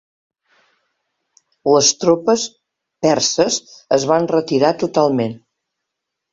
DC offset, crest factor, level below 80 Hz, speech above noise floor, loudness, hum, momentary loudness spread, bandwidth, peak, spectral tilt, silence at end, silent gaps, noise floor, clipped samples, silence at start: under 0.1%; 18 dB; -60 dBFS; 64 dB; -16 LUFS; none; 9 LU; 7.8 kHz; 0 dBFS; -3.5 dB/octave; 0.95 s; none; -79 dBFS; under 0.1%; 1.65 s